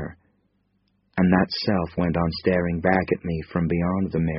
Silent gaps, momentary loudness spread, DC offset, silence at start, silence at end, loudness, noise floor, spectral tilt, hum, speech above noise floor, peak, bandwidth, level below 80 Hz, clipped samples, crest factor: none; 6 LU; under 0.1%; 0 s; 0 s; -23 LUFS; -68 dBFS; -6 dB/octave; none; 46 dB; -4 dBFS; 5.8 kHz; -44 dBFS; under 0.1%; 20 dB